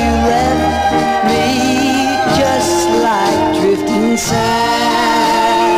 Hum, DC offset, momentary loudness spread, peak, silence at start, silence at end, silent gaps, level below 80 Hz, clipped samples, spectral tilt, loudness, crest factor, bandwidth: none; 0.2%; 2 LU; -4 dBFS; 0 s; 0 s; none; -32 dBFS; under 0.1%; -4 dB/octave; -13 LUFS; 10 dB; 16 kHz